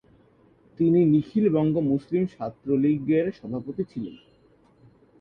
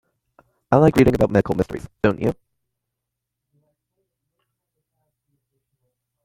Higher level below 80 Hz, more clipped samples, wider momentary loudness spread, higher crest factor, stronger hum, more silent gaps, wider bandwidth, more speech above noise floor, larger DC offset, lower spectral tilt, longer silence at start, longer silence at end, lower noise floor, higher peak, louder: second, -60 dBFS vs -44 dBFS; neither; about the same, 13 LU vs 11 LU; second, 16 dB vs 22 dB; neither; neither; second, 5.6 kHz vs 16.5 kHz; second, 36 dB vs 64 dB; neither; first, -10.5 dB/octave vs -8 dB/octave; about the same, 0.8 s vs 0.7 s; second, 1.05 s vs 3.9 s; second, -59 dBFS vs -82 dBFS; second, -10 dBFS vs 0 dBFS; second, -24 LUFS vs -19 LUFS